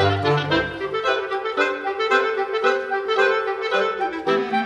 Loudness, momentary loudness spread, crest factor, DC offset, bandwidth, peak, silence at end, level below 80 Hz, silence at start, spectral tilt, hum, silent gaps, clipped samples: -21 LUFS; 5 LU; 16 dB; under 0.1%; 9.8 kHz; -6 dBFS; 0 s; -54 dBFS; 0 s; -5.5 dB/octave; none; none; under 0.1%